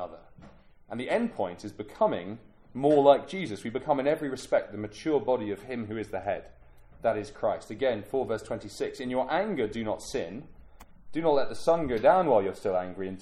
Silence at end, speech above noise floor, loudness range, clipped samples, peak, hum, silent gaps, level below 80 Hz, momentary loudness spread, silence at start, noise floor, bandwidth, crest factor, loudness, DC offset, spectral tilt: 0 s; 25 dB; 5 LU; under 0.1%; -6 dBFS; none; none; -56 dBFS; 15 LU; 0 s; -53 dBFS; 13 kHz; 22 dB; -29 LUFS; under 0.1%; -6 dB/octave